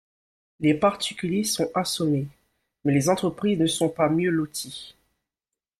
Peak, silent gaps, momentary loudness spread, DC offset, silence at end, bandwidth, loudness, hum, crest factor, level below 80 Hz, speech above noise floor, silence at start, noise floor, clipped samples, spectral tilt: -8 dBFS; none; 9 LU; under 0.1%; 0.9 s; 15 kHz; -24 LUFS; none; 18 dB; -60 dBFS; 65 dB; 0.6 s; -88 dBFS; under 0.1%; -5 dB/octave